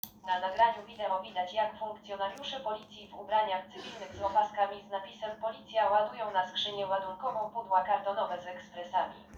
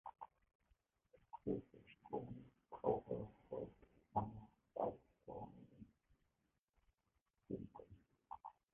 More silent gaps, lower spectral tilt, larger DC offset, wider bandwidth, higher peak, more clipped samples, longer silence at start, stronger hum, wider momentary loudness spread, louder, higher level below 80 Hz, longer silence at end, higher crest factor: second, none vs 0.55-0.59 s, 6.59-6.64 s, 7.21-7.25 s; second, -3.5 dB/octave vs -7 dB/octave; neither; first, over 20 kHz vs 3.7 kHz; first, -14 dBFS vs -24 dBFS; neither; about the same, 0.05 s vs 0.05 s; neither; second, 13 LU vs 19 LU; first, -33 LUFS vs -49 LUFS; about the same, -70 dBFS vs -72 dBFS; second, 0 s vs 0.2 s; second, 20 dB vs 26 dB